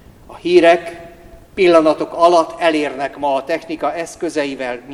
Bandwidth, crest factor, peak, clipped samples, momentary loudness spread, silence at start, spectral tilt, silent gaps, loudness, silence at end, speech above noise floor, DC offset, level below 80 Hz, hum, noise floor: 12 kHz; 16 dB; 0 dBFS; under 0.1%; 13 LU; 0.3 s; -4.5 dB/octave; none; -15 LUFS; 0 s; 25 dB; under 0.1%; -50 dBFS; none; -40 dBFS